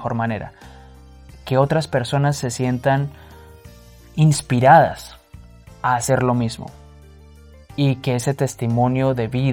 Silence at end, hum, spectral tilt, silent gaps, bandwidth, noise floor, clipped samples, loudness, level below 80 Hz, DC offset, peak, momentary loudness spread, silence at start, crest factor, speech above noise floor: 0 s; none; -6 dB/octave; none; 17 kHz; -44 dBFS; under 0.1%; -19 LUFS; -46 dBFS; under 0.1%; 0 dBFS; 18 LU; 0 s; 20 dB; 26 dB